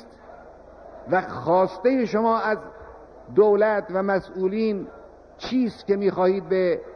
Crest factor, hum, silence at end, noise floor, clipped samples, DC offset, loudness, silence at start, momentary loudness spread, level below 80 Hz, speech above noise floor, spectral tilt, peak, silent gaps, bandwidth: 18 dB; none; 0 s; -45 dBFS; under 0.1%; under 0.1%; -23 LUFS; 0 s; 10 LU; -56 dBFS; 23 dB; -7.5 dB/octave; -6 dBFS; none; 6.4 kHz